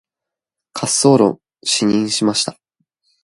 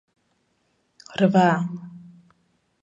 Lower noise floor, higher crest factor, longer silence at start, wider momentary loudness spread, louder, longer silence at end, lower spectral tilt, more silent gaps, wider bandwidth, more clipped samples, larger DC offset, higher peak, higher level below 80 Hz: first, -85 dBFS vs -69 dBFS; about the same, 18 dB vs 20 dB; second, 0.75 s vs 1.1 s; second, 12 LU vs 20 LU; first, -16 LUFS vs -21 LUFS; second, 0.7 s vs 0.85 s; second, -4 dB/octave vs -7 dB/octave; neither; first, 11.5 kHz vs 7.8 kHz; neither; neither; first, 0 dBFS vs -4 dBFS; first, -58 dBFS vs -70 dBFS